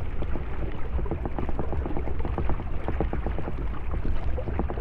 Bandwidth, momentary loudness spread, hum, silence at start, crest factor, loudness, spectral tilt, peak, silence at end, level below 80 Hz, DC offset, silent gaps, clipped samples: 3.7 kHz; 3 LU; none; 0 s; 16 dB; -32 LUFS; -9.5 dB/octave; -10 dBFS; 0 s; -30 dBFS; under 0.1%; none; under 0.1%